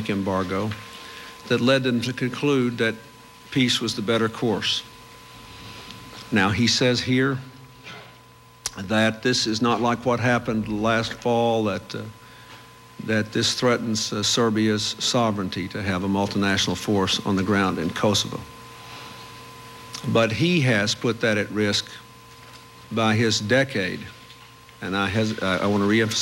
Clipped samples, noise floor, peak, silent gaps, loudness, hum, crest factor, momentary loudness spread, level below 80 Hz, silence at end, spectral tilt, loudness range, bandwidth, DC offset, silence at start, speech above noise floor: under 0.1%; -49 dBFS; -8 dBFS; none; -22 LUFS; none; 16 dB; 20 LU; -56 dBFS; 0 s; -4.5 dB/octave; 2 LU; 16 kHz; under 0.1%; 0 s; 27 dB